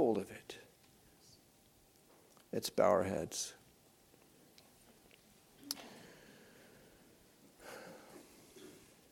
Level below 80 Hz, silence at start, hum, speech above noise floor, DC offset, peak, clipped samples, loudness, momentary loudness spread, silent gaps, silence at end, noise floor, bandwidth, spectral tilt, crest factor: -76 dBFS; 0 s; none; 33 dB; under 0.1%; -16 dBFS; under 0.1%; -38 LUFS; 29 LU; none; 0.35 s; -67 dBFS; 17.5 kHz; -4 dB/octave; 26 dB